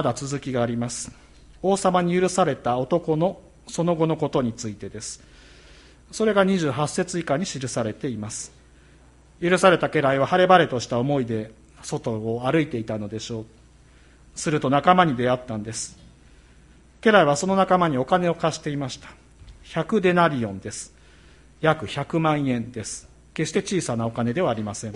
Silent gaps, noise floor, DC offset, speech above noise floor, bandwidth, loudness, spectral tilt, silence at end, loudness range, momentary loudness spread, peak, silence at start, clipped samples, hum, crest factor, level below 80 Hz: none; -52 dBFS; under 0.1%; 29 dB; 11.5 kHz; -23 LUFS; -5 dB/octave; 0 s; 5 LU; 16 LU; -2 dBFS; 0 s; under 0.1%; none; 22 dB; -52 dBFS